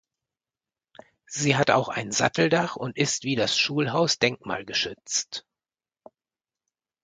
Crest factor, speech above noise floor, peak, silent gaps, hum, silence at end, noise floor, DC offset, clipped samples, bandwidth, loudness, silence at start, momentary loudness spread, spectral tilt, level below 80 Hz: 24 dB; over 65 dB; -4 dBFS; none; none; 1.65 s; under -90 dBFS; under 0.1%; under 0.1%; 10 kHz; -24 LUFS; 1.3 s; 8 LU; -3.5 dB/octave; -64 dBFS